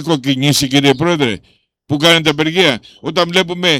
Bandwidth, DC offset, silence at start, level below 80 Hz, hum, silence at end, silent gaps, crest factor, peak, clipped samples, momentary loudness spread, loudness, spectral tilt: 18 kHz; under 0.1%; 0 s; -50 dBFS; none; 0 s; none; 14 dB; 0 dBFS; under 0.1%; 9 LU; -13 LUFS; -4 dB/octave